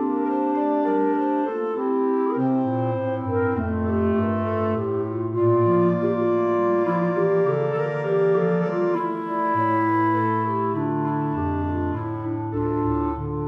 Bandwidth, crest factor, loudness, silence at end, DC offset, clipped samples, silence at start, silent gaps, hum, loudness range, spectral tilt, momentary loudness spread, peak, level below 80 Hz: 5.6 kHz; 12 dB; -23 LUFS; 0 s; under 0.1%; under 0.1%; 0 s; none; none; 2 LU; -10.5 dB/octave; 5 LU; -10 dBFS; -46 dBFS